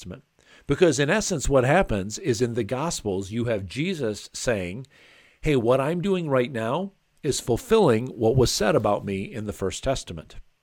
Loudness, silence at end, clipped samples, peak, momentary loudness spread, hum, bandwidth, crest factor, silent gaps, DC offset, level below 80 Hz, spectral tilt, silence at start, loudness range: -24 LUFS; 0.2 s; under 0.1%; -6 dBFS; 11 LU; none; 17.5 kHz; 18 dB; none; under 0.1%; -42 dBFS; -5 dB/octave; 0 s; 4 LU